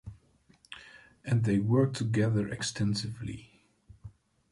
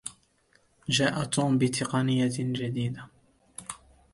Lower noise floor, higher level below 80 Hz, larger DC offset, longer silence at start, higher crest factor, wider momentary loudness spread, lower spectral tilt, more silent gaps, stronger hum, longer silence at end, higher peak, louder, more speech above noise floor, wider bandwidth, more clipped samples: about the same, -64 dBFS vs -66 dBFS; about the same, -58 dBFS vs -62 dBFS; neither; about the same, 0.05 s vs 0.05 s; about the same, 18 dB vs 20 dB; first, 20 LU vs 17 LU; about the same, -6 dB/octave vs -5 dB/octave; neither; neither; about the same, 0.45 s vs 0.4 s; second, -14 dBFS vs -10 dBFS; second, -30 LUFS vs -27 LUFS; second, 35 dB vs 39 dB; about the same, 11.5 kHz vs 11.5 kHz; neither